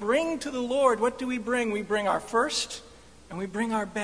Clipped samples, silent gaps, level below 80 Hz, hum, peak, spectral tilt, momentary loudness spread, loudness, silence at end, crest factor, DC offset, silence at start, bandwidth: under 0.1%; none; -58 dBFS; none; -10 dBFS; -3.5 dB/octave; 11 LU; -27 LUFS; 0 s; 18 dB; 0.1%; 0 s; 11 kHz